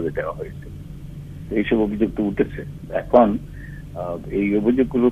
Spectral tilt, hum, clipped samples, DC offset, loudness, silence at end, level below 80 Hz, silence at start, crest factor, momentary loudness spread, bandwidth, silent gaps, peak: -9 dB/octave; none; under 0.1%; under 0.1%; -21 LUFS; 0 s; -40 dBFS; 0 s; 20 dB; 20 LU; 13.5 kHz; none; 0 dBFS